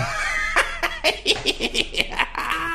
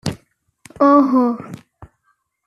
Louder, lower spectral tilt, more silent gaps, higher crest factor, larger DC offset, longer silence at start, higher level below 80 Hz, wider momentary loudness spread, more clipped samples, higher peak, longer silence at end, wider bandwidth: second, -21 LUFS vs -15 LUFS; second, -2 dB/octave vs -7 dB/octave; neither; first, 22 dB vs 16 dB; neither; about the same, 0 s vs 0.05 s; first, -36 dBFS vs -54 dBFS; second, 3 LU vs 25 LU; neither; about the same, 0 dBFS vs -2 dBFS; second, 0 s vs 0.6 s; first, 16 kHz vs 11.5 kHz